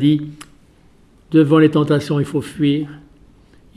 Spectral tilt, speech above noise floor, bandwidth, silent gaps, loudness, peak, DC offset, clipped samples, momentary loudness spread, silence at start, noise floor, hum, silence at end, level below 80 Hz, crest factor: -7.5 dB/octave; 34 dB; 12 kHz; none; -16 LUFS; -2 dBFS; under 0.1%; under 0.1%; 10 LU; 0 s; -50 dBFS; none; 0.8 s; -52 dBFS; 16 dB